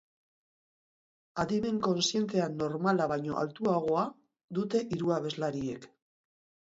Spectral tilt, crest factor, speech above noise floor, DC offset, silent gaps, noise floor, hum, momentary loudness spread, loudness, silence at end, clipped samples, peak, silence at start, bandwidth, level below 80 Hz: -5.5 dB/octave; 18 dB; over 59 dB; under 0.1%; 4.44-4.48 s; under -90 dBFS; none; 9 LU; -31 LUFS; 0.8 s; under 0.1%; -14 dBFS; 1.35 s; 8 kHz; -66 dBFS